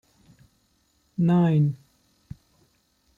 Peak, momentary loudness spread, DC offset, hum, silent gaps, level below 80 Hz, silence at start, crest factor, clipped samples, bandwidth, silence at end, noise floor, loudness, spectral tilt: -12 dBFS; 27 LU; under 0.1%; none; none; -60 dBFS; 1.2 s; 16 dB; under 0.1%; 4.2 kHz; 1.45 s; -67 dBFS; -22 LUFS; -10 dB/octave